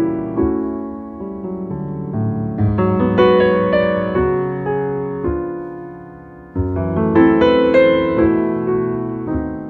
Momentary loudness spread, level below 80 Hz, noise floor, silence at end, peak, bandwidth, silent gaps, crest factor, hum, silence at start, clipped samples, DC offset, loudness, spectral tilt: 16 LU; -36 dBFS; -37 dBFS; 0 s; 0 dBFS; 4.6 kHz; none; 16 dB; none; 0 s; under 0.1%; under 0.1%; -17 LUFS; -9.5 dB/octave